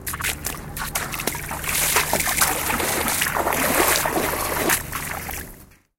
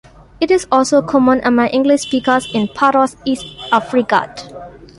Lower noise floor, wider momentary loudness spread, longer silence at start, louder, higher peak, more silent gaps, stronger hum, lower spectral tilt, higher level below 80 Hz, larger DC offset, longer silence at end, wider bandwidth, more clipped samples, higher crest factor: first, -45 dBFS vs -34 dBFS; about the same, 11 LU vs 10 LU; second, 0 s vs 0.4 s; second, -21 LUFS vs -15 LUFS; about the same, -2 dBFS vs -2 dBFS; neither; neither; second, -2 dB/octave vs -4.5 dB/octave; first, -40 dBFS vs -48 dBFS; neither; about the same, 0.35 s vs 0.3 s; first, 17 kHz vs 11.5 kHz; neither; first, 22 dB vs 14 dB